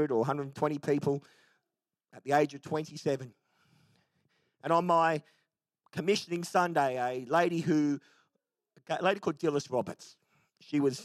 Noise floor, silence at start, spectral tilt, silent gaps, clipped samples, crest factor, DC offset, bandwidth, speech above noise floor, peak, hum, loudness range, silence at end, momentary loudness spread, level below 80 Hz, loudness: -89 dBFS; 0 s; -6 dB/octave; none; under 0.1%; 20 dB; under 0.1%; 14 kHz; 58 dB; -12 dBFS; none; 4 LU; 0 s; 10 LU; -82 dBFS; -31 LUFS